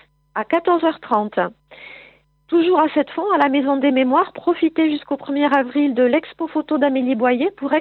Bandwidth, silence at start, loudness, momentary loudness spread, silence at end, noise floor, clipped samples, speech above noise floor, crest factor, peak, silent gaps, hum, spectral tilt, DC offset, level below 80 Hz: 4.5 kHz; 0.35 s; -18 LUFS; 8 LU; 0 s; -49 dBFS; under 0.1%; 32 dB; 16 dB; -2 dBFS; none; none; -7.5 dB/octave; under 0.1%; -66 dBFS